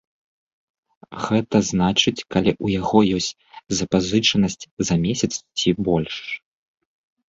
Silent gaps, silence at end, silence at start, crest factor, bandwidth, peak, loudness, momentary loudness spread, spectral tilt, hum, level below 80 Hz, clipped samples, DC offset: 4.71-4.77 s; 0.9 s; 1.1 s; 20 dB; 8 kHz; -2 dBFS; -21 LUFS; 10 LU; -4.5 dB/octave; none; -46 dBFS; under 0.1%; under 0.1%